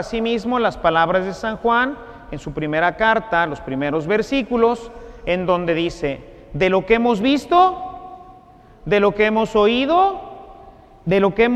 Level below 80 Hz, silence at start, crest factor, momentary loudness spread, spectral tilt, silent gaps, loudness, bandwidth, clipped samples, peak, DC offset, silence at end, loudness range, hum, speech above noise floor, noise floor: -42 dBFS; 0 s; 18 dB; 17 LU; -6 dB/octave; none; -18 LUFS; 9.4 kHz; under 0.1%; -2 dBFS; under 0.1%; 0 s; 2 LU; none; 28 dB; -46 dBFS